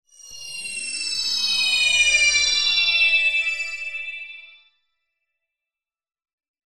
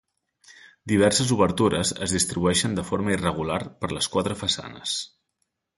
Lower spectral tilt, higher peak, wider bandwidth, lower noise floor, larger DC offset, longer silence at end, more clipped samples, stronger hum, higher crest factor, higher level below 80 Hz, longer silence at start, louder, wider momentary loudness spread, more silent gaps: second, 3 dB/octave vs -4 dB/octave; about the same, -6 dBFS vs -6 dBFS; first, 14.5 kHz vs 12 kHz; first, -89 dBFS vs -77 dBFS; neither; first, 2.2 s vs 0.7 s; neither; neither; about the same, 16 dB vs 20 dB; second, -56 dBFS vs -46 dBFS; second, 0.2 s vs 0.5 s; first, -18 LUFS vs -24 LUFS; first, 16 LU vs 9 LU; neither